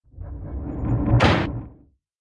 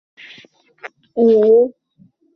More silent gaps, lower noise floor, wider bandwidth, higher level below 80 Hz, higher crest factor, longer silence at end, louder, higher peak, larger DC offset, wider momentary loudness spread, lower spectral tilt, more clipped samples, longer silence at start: neither; about the same, -53 dBFS vs -54 dBFS; first, 8.8 kHz vs 5.6 kHz; first, -32 dBFS vs -66 dBFS; about the same, 18 dB vs 14 dB; second, 0.45 s vs 0.65 s; second, -22 LUFS vs -14 LUFS; about the same, -4 dBFS vs -4 dBFS; neither; second, 18 LU vs 26 LU; about the same, -7 dB/octave vs -8 dB/octave; neither; second, 0.15 s vs 0.85 s